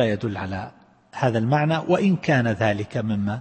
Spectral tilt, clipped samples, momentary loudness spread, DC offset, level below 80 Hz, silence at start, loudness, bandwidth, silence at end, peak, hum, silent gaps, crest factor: -7.5 dB/octave; under 0.1%; 11 LU; under 0.1%; -56 dBFS; 0 s; -22 LUFS; 8.8 kHz; 0 s; -6 dBFS; none; none; 16 dB